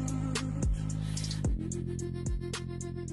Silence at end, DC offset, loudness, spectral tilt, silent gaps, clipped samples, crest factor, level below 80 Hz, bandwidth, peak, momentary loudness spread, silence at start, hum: 0 s; under 0.1%; -35 LUFS; -5.5 dB/octave; none; under 0.1%; 12 dB; -38 dBFS; 12 kHz; -20 dBFS; 5 LU; 0 s; none